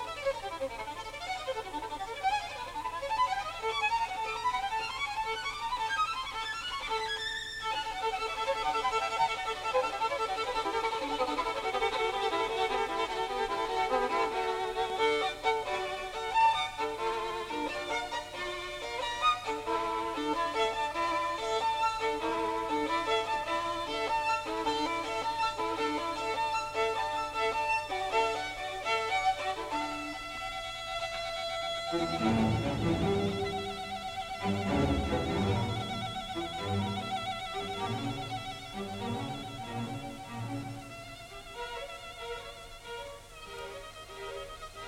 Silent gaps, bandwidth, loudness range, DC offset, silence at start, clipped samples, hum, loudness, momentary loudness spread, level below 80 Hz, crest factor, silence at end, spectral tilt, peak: none; 16 kHz; 7 LU; under 0.1%; 0 s; under 0.1%; none; -33 LUFS; 10 LU; -52 dBFS; 16 dB; 0 s; -4.5 dB/octave; -16 dBFS